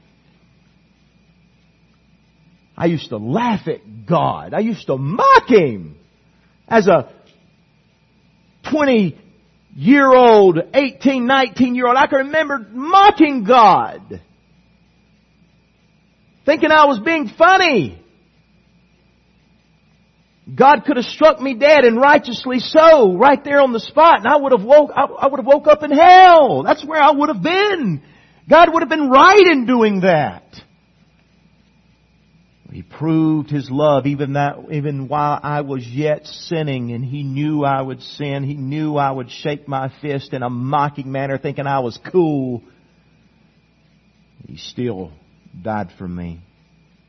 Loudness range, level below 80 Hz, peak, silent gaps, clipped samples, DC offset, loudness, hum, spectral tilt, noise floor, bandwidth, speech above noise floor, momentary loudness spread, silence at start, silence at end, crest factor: 12 LU; -54 dBFS; 0 dBFS; none; under 0.1%; under 0.1%; -14 LUFS; none; -6.5 dB/octave; -56 dBFS; 6.4 kHz; 42 dB; 15 LU; 2.8 s; 0.7 s; 16 dB